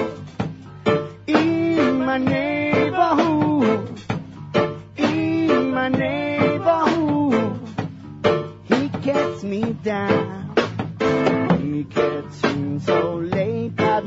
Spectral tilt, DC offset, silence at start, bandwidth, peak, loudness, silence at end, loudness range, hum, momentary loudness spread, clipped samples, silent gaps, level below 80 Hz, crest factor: -7 dB/octave; under 0.1%; 0 s; 8 kHz; -2 dBFS; -21 LUFS; 0 s; 3 LU; none; 8 LU; under 0.1%; none; -54 dBFS; 18 dB